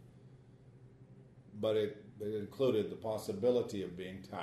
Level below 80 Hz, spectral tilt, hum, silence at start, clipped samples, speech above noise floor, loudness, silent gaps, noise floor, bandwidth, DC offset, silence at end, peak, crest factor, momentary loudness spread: -72 dBFS; -6.5 dB/octave; none; 0 s; under 0.1%; 23 dB; -37 LUFS; none; -59 dBFS; 13 kHz; under 0.1%; 0 s; -20 dBFS; 18 dB; 12 LU